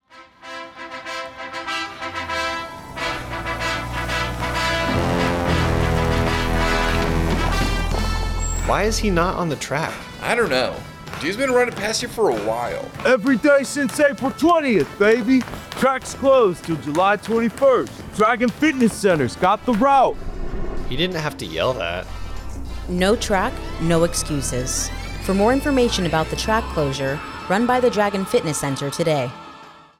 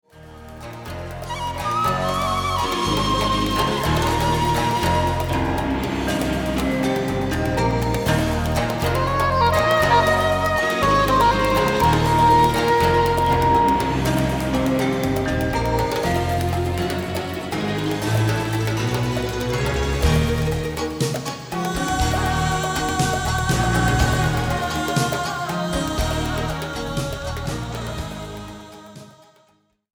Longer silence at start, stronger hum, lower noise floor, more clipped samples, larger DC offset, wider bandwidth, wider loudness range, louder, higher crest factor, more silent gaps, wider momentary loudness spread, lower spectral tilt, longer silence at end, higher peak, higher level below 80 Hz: about the same, 0.15 s vs 0.15 s; neither; second, -43 dBFS vs -61 dBFS; neither; neither; second, 17 kHz vs over 20 kHz; about the same, 5 LU vs 7 LU; about the same, -20 LUFS vs -21 LUFS; about the same, 14 dB vs 18 dB; neither; about the same, 12 LU vs 11 LU; about the same, -4.5 dB/octave vs -5 dB/octave; second, 0.2 s vs 0.85 s; about the same, -6 dBFS vs -4 dBFS; about the same, -32 dBFS vs -32 dBFS